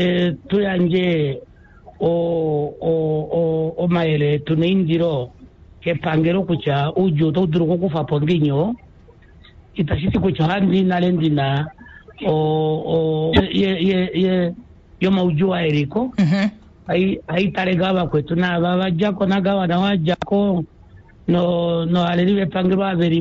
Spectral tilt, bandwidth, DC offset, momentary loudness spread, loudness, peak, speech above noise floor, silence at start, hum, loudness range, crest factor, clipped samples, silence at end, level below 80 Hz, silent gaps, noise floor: -8.5 dB/octave; 7.2 kHz; under 0.1%; 6 LU; -19 LUFS; -4 dBFS; 28 dB; 0 s; none; 2 LU; 14 dB; under 0.1%; 0 s; -44 dBFS; none; -46 dBFS